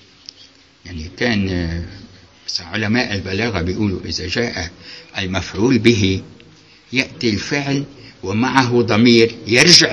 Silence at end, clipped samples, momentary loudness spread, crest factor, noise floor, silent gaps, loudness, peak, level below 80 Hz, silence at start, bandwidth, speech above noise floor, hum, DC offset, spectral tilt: 0 s; under 0.1%; 17 LU; 18 dB; -47 dBFS; none; -16 LUFS; 0 dBFS; -42 dBFS; 0.85 s; 11 kHz; 30 dB; none; under 0.1%; -4 dB/octave